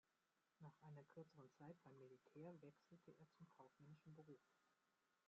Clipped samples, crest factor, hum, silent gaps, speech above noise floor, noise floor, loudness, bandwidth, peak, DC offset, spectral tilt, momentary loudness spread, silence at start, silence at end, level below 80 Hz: under 0.1%; 18 dB; none; none; 23 dB; -89 dBFS; -66 LUFS; 7 kHz; -50 dBFS; under 0.1%; -7.5 dB/octave; 6 LU; 0.1 s; 0.05 s; under -90 dBFS